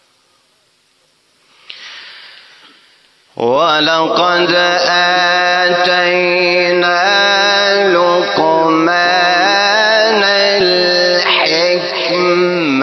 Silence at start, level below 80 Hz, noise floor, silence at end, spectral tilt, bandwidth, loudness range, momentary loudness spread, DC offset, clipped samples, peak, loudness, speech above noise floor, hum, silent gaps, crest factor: 1.7 s; -62 dBFS; -56 dBFS; 0 s; -3 dB/octave; 6.4 kHz; 6 LU; 4 LU; under 0.1%; under 0.1%; 0 dBFS; -10 LUFS; 44 dB; none; none; 12 dB